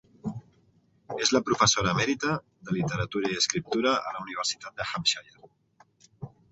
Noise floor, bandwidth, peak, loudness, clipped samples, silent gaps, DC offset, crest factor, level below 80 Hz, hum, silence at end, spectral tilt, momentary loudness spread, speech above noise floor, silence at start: -64 dBFS; 8.4 kHz; -6 dBFS; -27 LUFS; under 0.1%; none; under 0.1%; 22 dB; -56 dBFS; none; 0.25 s; -3 dB/octave; 16 LU; 37 dB; 0.25 s